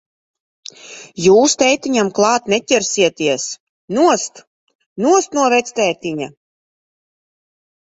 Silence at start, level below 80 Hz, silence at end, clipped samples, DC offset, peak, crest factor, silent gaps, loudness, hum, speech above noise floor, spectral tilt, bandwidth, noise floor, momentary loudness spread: 0.85 s; -60 dBFS; 1.55 s; under 0.1%; under 0.1%; 0 dBFS; 16 dB; 3.60-3.88 s, 4.47-4.67 s, 4.75-4.79 s, 4.86-4.96 s; -15 LUFS; none; 21 dB; -3 dB/octave; 8 kHz; -36 dBFS; 20 LU